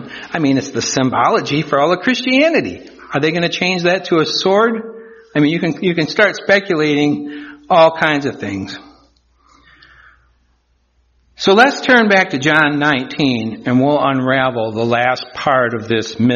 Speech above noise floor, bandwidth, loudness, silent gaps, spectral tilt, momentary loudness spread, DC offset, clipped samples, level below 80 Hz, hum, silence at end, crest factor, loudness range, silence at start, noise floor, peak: 45 dB; 7.2 kHz; -14 LUFS; none; -3.5 dB/octave; 11 LU; under 0.1%; under 0.1%; -54 dBFS; none; 0 s; 16 dB; 5 LU; 0 s; -59 dBFS; 0 dBFS